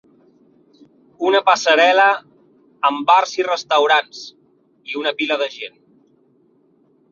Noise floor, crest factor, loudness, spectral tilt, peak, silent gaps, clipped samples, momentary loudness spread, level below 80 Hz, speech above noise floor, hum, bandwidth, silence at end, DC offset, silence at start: -57 dBFS; 18 dB; -16 LUFS; -1.5 dB/octave; 0 dBFS; none; under 0.1%; 21 LU; -72 dBFS; 41 dB; none; 7.4 kHz; 1.45 s; under 0.1%; 1.2 s